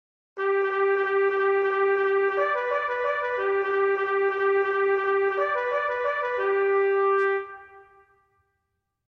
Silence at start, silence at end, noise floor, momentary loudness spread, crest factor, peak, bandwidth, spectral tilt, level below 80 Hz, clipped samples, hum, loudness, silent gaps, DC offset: 0.35 s; 1.25 s; -79 dBFS; 4 LU; 12 dB; -12 dBFS; 5.4 kHz; -5 dB/octave; -70 dBFS; under 0.1%; none; -24 LUFS; none; under 0.1%